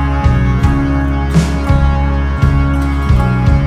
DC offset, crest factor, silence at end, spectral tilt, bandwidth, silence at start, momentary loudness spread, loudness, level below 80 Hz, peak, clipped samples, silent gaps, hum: under 0.1%; 12 dB; 0 s; -7.5 dB/octave; 10.5 kHz; 0 s; 2 LU; -13 LUFS; -14 dBFS; 0 dBFS; under 0.1%; none; none